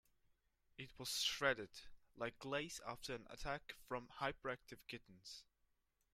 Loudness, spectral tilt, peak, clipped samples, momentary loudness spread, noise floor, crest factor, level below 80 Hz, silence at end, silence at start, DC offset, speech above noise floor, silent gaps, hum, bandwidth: -45 LUFS; -2.5 dB/octave; -24 dBFS; under 0.1%; 16 LU; -83 dBFS; 24 dB; -66 dBFS; 0.7 s; 0.8 s; under 0.1%; 36 dB; none; none; 16 kHz